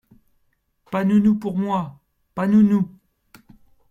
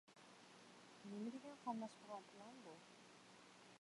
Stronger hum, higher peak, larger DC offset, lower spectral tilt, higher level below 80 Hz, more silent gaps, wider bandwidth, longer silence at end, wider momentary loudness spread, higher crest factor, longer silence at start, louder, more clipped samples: neither; first, -8 dBFS vs -34 dBFS; neither; first, -9 dB/octave vs -5 dB/octave; first, -58 dBFS vs under -90 dBFS; neither; second, 7 kHz vs 11.5 kHz; first, 1.05 s vs 0.05 s; about the same, 13 LU vs 14 LU; second, 14 dB vs 22 dB; first, 0.9 s vs 0.05 s; first, -20 LUFS vs -56 LUFS; neither